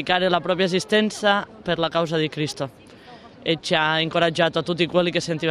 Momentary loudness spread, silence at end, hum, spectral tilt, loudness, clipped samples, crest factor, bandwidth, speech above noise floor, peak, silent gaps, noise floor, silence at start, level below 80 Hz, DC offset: 7 LU; 0 s; none; -4.5 dB/octave; -22 LUFS; under 0.1%; 18 dB; 14 kHz; 23 dB; -4 dBFS; none; -44 dBFS; 0 s; -58 dBFS; under 0.1%